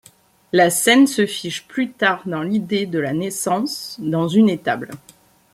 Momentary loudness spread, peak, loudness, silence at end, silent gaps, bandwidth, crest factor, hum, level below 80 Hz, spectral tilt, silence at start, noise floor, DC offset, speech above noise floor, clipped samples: 12 LU; -2 dBFS; -19 LUFS; 0.55 s; none; 16 kHz; 18 dB; none; -62 dBFS; -4 dB/octave; 0.55 s; -52 dBFS; under 0.1%; 34 dB; under 0.1%